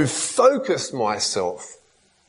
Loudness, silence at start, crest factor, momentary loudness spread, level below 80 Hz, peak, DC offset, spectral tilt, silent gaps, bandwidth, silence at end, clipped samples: -21 LUFS; 0 s; 20 dB; 14 LU; -64 dBFS; -4 dBFS; under 0.1%; -3.5 dB/octave; none; 11 kHz; 0.55 s; under 0.1%